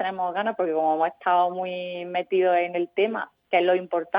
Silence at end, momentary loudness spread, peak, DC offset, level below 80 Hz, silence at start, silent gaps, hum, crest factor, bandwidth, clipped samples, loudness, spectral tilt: 0 s; 8 LU; -8 dBFS; under 0.1%; -78 dBFS; 0 s; none; none; 18 dB; 5.2 kHz; under 0.1%; -24 LUFS; -8 dB/octave